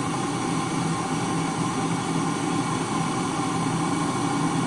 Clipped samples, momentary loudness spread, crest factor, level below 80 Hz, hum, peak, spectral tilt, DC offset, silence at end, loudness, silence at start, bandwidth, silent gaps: under 0.1%; 1 LU; 12 dB; -56 dBFS; none; -12 dBFS; -5 dB/octave; under 0.1%; 0 s; -25 LUFS; 0 s; 11.5 kHz; none